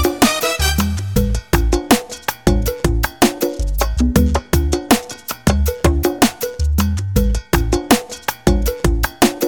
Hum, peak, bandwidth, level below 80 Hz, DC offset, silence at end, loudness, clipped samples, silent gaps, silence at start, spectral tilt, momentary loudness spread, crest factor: none; 0 dBFS; 19.5 kHz; -20 dBFS; under 0.1%; 0 s; -17 LUFS; under 0.1%; none; 0 s; -5 dB/octave; 4 LU; 16 dB